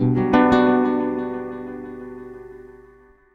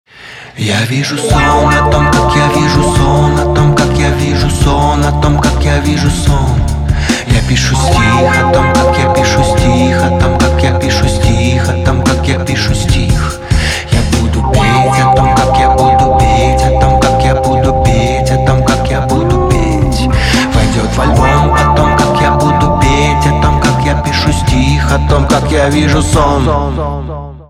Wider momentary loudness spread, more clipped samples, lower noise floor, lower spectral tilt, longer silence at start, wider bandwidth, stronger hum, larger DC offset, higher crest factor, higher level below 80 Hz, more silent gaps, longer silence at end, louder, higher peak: first, 22 LU vs 4 LU; neither; first, -51 dBFS vs -31 dBFS; first, -8.5 dB/octave vs -5.5 dB/octave; second, 0 s vs 0.2 s; second, 6.8 kHz vs 15 kHz; neither; neither; first, 18 dB vs 8 dB; second, -48 dBFS vs -18 dBFS; neither; first, 0.6 s vs 0.05 s; second, -19 LUFS vs -10 LUFS; about the same, -2 dBFS vs 0 dBFS